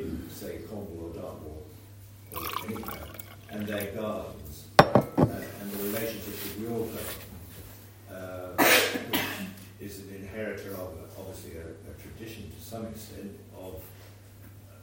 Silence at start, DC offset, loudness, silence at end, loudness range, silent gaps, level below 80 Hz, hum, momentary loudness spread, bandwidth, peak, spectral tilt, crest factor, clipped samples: 0 s; under 0.1%; -29 LUFS; 0 s; 14 LU; none; -54 dBFS; none; 23 LU; 16.5 kHz; 0 dBFS; -4 dB/octave; 32 dB; under 0.1%